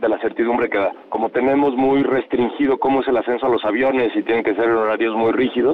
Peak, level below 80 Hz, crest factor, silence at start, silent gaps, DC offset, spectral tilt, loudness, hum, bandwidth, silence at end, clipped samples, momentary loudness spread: -10 dBFS; -54 dBFS; 8 dB; 0 s; none; under 0.1%; -8 dB/octave; -18 LUFS; none; 4.9 kHz; 0 s; under 0.1%; 4 LU